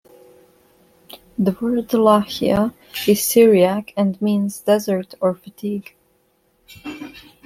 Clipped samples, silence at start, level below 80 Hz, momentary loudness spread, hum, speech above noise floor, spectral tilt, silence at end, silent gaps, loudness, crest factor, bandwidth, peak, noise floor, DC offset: under 0.1%; 1.15 s; -54 dBFS; 20 LU; none; 45 dB; -5.5 dB/octave; 0.25 s; none; -18 LUFS; 18 dB; 16.5 kHz; -2 dBFS; -62 dBFS; under 0.1%